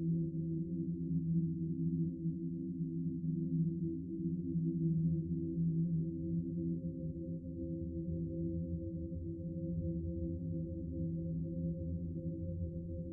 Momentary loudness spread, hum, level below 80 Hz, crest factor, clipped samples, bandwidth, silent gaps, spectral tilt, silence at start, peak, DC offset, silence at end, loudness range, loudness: 7 LU; none; -56 dBFS; 12 dB; under 0.1%; 0.6 kHz; none; -20.5 dB/octave; 0 s; -24 dBFS; under 0.1%; 0 s; 4 LU; -39 LUFS